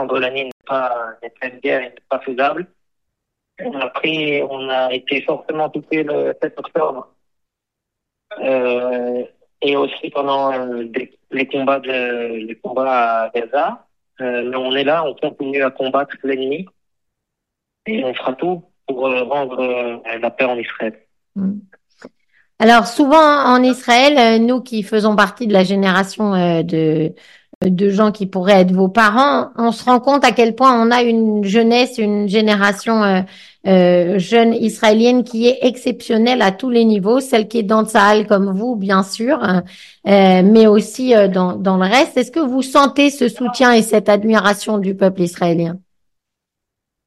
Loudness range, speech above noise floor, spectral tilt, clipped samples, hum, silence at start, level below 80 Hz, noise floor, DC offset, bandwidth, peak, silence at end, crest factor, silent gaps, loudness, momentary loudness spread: 9 LU; 66 dB; -5.5 dB/octave; under 0.1%; none; 0 s; -58 dBFS; -81 dBFS; under 0.1%; 12.5 kHz; 0 dBFS; 1.3 s; 14 dB; 0.52-0.60 s, 27.55-27.61 s; -15 LUFS; 12 LU